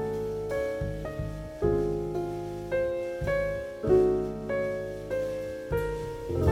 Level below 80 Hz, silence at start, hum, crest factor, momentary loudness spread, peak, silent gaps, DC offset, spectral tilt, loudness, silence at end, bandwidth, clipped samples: -42 dBFS; 0 s; none; 18 dB; 10 LU; -12 dBFS; none; under 0.1%; -7.5 dB/octave; -30 LUFS; 0 s; 16 kHz; under 0.1%